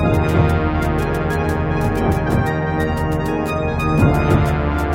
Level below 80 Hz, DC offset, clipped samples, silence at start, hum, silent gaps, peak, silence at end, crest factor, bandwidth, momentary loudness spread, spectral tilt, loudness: -26 dBFS; under 0.1%; under 0.1%; 0 s; none; none; -2 dBFS; 0 s; 14 dB; 16.5 kHz; 4 LU; -7.5 dB/octave; -18 LUFS